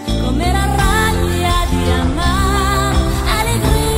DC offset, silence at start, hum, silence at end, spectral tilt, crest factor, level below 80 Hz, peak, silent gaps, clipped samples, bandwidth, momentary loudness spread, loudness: under 0.1%; 0 s; none; 0 s; -5 dB/octave; 14 dB; -18 dBFS; -2 dBFS; none; under 0.1%; 16.5 kHz; 2 LU; -15 LUFS